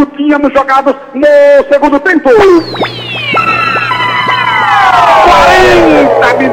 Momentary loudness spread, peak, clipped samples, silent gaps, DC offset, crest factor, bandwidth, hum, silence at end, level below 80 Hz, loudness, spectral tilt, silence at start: 7 LU; 0 dBFS; 0.8%; none; under 0.1%; 6 dB; 16.5 kHz; none; 0 s; -32 dBFS; -6 LUFS; -5 dB/octave; 0 s